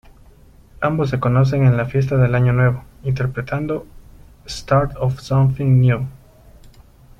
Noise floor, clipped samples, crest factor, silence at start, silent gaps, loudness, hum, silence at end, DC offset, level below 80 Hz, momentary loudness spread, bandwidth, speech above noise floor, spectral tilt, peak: -47 dBFS; under 0.1%; 16 dB; 0.8 s; none; -18 LUFS; none; 0.5 s; under 0.1%; -40 dBFS; 10 LU; 7.6 kHz; 30 dB; -8 dB/octave; -2 dBFS